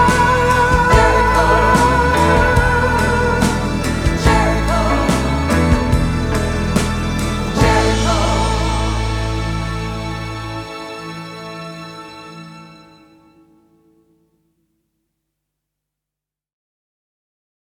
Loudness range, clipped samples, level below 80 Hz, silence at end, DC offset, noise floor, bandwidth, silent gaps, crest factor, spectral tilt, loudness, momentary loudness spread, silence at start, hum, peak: 18 LU; under 0.1%; -24 dBFS; 5.05 s; under 0.1%; -86 dBFS; 16 kHz; none; 16 dB; -5.5 dB/octave; -15 LUFS; 17 LU; 0 s; 50 Hz at -50 dBFS; 0 dBFS